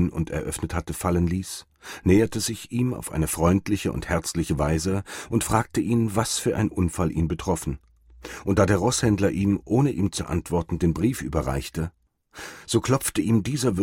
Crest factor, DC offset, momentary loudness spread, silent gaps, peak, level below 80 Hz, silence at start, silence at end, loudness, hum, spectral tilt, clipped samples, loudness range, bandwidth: 18 dB; under 0.1%; 10 LU; none; -6 dBFS; -40 dBFS; 0 s; 0 s; -24 LUFS; none; -5.5 dB/octave; under 0.1%; 2 LU; 16.5 kHz